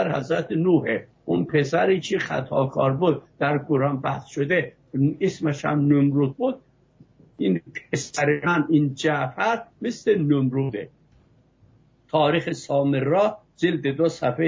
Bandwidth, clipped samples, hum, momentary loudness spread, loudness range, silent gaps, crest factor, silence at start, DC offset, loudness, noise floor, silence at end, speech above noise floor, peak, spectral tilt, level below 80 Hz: 7.8 kHz; under 0.1%; none; 7 LU; 2 LU; none; 14 dB; 0 s; under 0.1%; -23 LUFS; -58 dBFS; 0 s; 36 dB; -8 dBFS; -6.5 dB/octave; -60 dBFS